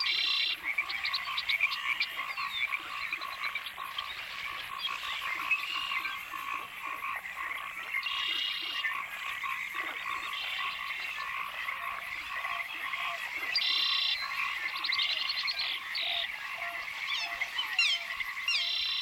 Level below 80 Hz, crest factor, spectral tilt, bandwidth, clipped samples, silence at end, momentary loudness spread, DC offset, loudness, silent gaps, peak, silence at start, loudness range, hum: -70 dBFS; 18 dB; 1 dB/octave; 17 kHz; under 0.1%; 0 s; 9 LU; under 0.1%; -32 LUFS; none; -16 dBFS; 0 s; 5 LU; none